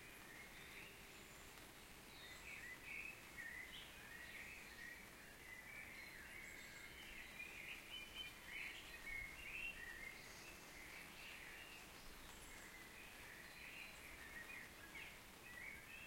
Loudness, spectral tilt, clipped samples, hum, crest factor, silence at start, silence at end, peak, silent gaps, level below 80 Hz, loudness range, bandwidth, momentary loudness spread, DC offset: -54 LUFS; -2 dB/octave; under 0.1%; none; 18 dB; 0 s; 0 s; -38 dBFS; none; -70 dBFS; 5 LU; 16.5 kHz; 7 LU; under 0.1%